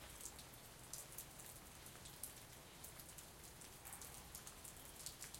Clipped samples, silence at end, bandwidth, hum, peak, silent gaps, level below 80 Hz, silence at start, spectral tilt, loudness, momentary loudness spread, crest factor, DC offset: under 0.1%; 0 s; 17 kHz; none; -26 dBFS; none; -68 dBFS; 0 s; -2 dB/octave; -54 LUFS; 5 LU; 30 dB; under 0.1%